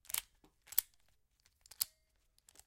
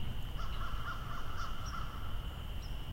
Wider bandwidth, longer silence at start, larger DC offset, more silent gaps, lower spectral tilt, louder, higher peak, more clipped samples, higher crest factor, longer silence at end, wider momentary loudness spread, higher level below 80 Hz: about the same, 16.5 kHz vs 16 kHz; first, 0.15 s vs 0 s; neither; neither; second, 2.5 dB/octave vs -5 dB/octave; first, -39 LUFS vs -43 LUFS; first, -8 dBFS vs -26 dBFS; neither; first, 38 dB vs 12 dB; first, 0.8 s vs 0 s; about the same, 4 LU vs 3 LU; second, -76 dBFS vs -42 dBFS